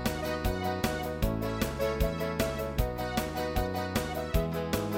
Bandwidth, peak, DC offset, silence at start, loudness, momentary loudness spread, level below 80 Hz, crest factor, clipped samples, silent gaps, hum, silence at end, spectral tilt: 17 kHz; -12 dBFS; under 0.1%; 0 s; -32 LUFS; 1 LU; -38 dBFS; 20 dB; under 0.1%; none; none; 0 s; -5.5 dB/octave